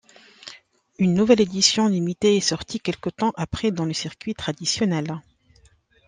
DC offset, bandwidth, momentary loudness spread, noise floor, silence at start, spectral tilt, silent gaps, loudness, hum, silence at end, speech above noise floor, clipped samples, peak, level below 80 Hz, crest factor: under 0.1%; 10 kHz; 16 LU; -58 dBFS; 0.45 s; -4.5 dB/octave; none; -22 LUFS; none; 0.85 s; 36 dB; under 0.1%; -2 dBFS; -52 dBFS; 20 dB